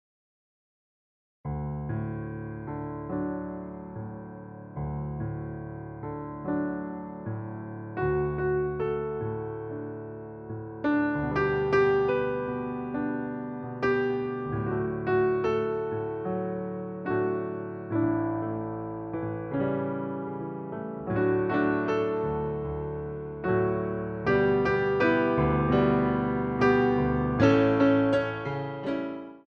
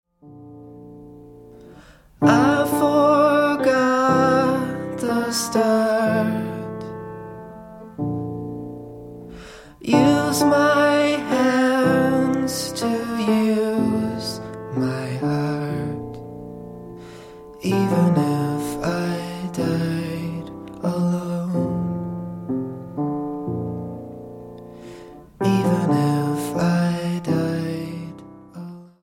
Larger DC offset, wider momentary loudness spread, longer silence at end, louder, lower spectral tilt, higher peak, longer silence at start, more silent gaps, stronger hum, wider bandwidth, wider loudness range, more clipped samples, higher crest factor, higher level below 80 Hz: neither; second, 14 LU vs 22 LU; about the same, 0.05 s vs 0.15 s; second, -28 LUFS vs -21 LUFS; first, -8.5 dB/octave vs -6 dB/octave; second, -10 dBFS vs -2 dBFS; first, 1.45 s vs 0.25 s; neither; neither; second, 6.6 kHz vs 16.5 kHz; about the same, 11 LU vs 9 LU; neither; about the same, 20 dB vs 18 dB; first, -48 dBFS vs -54 dBFS